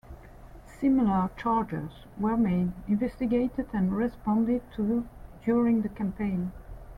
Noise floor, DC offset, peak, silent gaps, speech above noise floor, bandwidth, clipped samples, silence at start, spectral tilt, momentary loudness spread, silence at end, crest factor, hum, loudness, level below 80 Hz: -47 dBFS; under 0.1%; -14 dBFS; none; 21 dB; 5 kHz; under 0.1%; 0.1 s; -9.5 dB/octave; 10 LU; 0 s; 14 dB; none; -28 LUFS; -48 dBFS